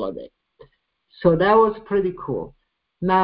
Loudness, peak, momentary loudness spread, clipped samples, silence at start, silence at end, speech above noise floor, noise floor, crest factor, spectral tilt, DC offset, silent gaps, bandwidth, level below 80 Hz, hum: -20 LUFS; -4 dBFS; 16 LU; under 0.1%; 0 s; 0 s; 42 dB; -62 dBFS; 18 dB; -11.5 dB/octave; under 0.1%; none; 5.2 kHz; -50 dBFS; none